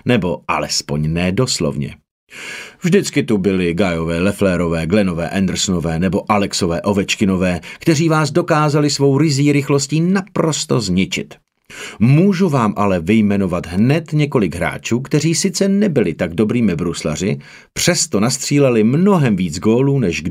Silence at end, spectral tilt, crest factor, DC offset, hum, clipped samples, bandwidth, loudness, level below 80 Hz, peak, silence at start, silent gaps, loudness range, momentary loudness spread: 0 s; -5.5 dB/octave; 16 dB; under 0.1%; none; under 0.1%; 16 kHz; -16 LUFS; -42 dBFS; 0 dBFS; 0.05 s; 2.11-2.27 s; 3 LU; 7 LU